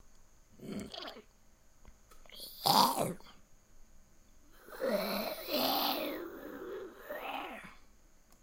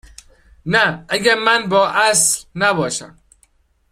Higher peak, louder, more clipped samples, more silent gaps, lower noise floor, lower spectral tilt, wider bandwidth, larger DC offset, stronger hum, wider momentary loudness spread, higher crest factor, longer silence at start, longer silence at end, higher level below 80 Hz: second, -10 dBFS vs 0 dBFS; second, -35 LUFS vs -15 LUFS; neither; neither; first, -62 dBFS vs -58 dBFS; about the same, -3 dB/octave vs -2 dB/octave; about the same, 16 kHz vs 16 kHz; neither; neither; first, 21 LU vs 9 LU; first, 28 dB vs 18 dB; second, 0.05 s vs 0.65 s; second, 0.05 s vs 0.85 s; second, -62 dBFS vs -50 dBFS